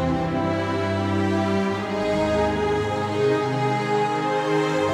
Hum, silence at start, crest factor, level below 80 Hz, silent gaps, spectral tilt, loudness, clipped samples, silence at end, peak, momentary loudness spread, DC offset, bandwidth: none; 0 s; 12 dB; -46 dBFS; none; -6.5 dB/octave; -23 LUFS; under 0.1%; 0 s; -10 dBFS; 2 LU; under 0.1%; 12 kHz